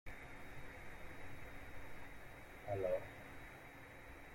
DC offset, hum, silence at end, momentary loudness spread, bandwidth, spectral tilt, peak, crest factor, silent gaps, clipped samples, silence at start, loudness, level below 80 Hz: under 0.1%; none; 0 s; 14 LU; 16.5 kHz; -6 dB/octave; -28 dBFS; 20 dB; none; under 0.1%; 0.05 s; -50 LUFS; -60 dBFS